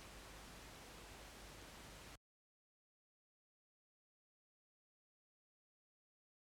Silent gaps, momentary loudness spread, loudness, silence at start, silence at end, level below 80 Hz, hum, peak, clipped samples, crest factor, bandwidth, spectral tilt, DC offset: none; 2 LU; -57 LUFS; 0 s; 4.3 s; -68 dBFS; none; -44 dBFS; under 0.1%; 18 dB; 19 kHz; -3 dB/octave; under 0.1%